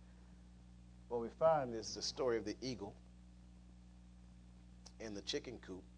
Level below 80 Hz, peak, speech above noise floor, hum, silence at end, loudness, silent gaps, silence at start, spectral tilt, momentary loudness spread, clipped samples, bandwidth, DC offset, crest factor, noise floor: -62 dBFS; -22 dBFS; 19 dB; 60 Hz at -60 dBFS; 0 s; -41 LUFS; none; 0 s; -4 dB/octave; 26 LU; under 0.1%; 10 kHz; under 0.1%; 22 dB; -60 dBFS